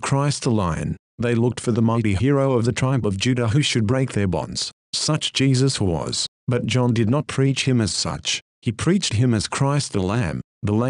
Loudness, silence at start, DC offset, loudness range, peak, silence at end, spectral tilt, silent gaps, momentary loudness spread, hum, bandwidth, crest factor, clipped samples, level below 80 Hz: -21 LUFS; 0 s; under 0.1%; 1 LU; -6 dBFS; 0 s; -5 dB/octave; 0.99-1.18 s, 4.73-4.93 s, 6.28-6.47 s, 8.42-8.62 s, 10.44-10.61 s; 6 LU; none; 11 kHz; 14 dB; under 0.1%; -46 dBFS